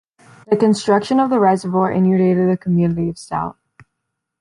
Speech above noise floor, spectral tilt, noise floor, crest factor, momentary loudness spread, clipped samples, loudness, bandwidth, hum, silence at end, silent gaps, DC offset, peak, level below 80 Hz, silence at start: 61 dB; -7.5 dB/octave; -77 dBFS; 14 dB; 9 LU; under 0.1%; -17 LUFS; 11 kHz; none; 0.9 s; none; under 0.1%; -2 dBFS; -52 dBFS; 0.5 s